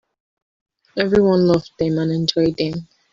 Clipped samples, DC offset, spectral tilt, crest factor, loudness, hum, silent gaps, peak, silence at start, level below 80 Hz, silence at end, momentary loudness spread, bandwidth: under 0.1%; under 0.1%; -7 dB/octave; 16 dB; -18 LUFS; none; none; -4 dBFS; 0.95 s; -48 dBFS; 0.3 s; 10 LU; 7.6 kHz